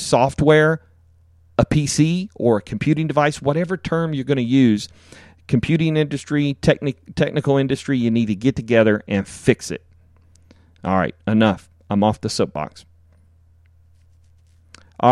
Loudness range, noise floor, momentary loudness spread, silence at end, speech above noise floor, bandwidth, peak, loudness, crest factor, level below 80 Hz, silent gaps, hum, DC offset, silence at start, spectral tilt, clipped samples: 3 LU; -53 dBFS; 8 LU; 0 s; 34 dB; 12.5 kHz; -2 dBFS; -19 LUFS; 18 dB; -46 dBFS; none; none; under 0.1%; 0 s; -6 dB/octave; under 0.1%